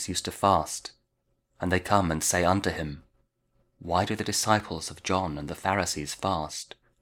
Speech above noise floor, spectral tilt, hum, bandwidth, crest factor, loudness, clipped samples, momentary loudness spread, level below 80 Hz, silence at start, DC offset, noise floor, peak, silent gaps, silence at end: 47 dB; -4 dB/octave; none; 19 kHz; 24 dB; -27 LUFS; under 0.1%; 13 LU; -50 dBFS; 0 s; under 0.1%; -75 dBFS; -6 dBFS; none; 0.4 s